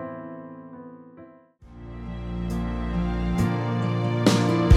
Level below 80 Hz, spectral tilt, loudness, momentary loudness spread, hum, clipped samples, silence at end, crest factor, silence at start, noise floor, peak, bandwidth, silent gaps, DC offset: -36 dBFS; -6.5 dB/octave; -25 LUFS; 22 LU; none; under 0.1%; 0 s; 20 dB; 0 s; -49 dBFS; -4 dBFS; 14.5 kHz; none; under 0.1%